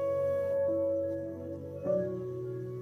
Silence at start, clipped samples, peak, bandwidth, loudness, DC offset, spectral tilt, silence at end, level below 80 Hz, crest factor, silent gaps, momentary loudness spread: 0 s; under 0.1%; -20 dBFS; 12 kHz; -33 LUFS; under 0.1%; -9.5 dB/octave; 0 s; -68 dBFS; 12 dB; none; 9 LU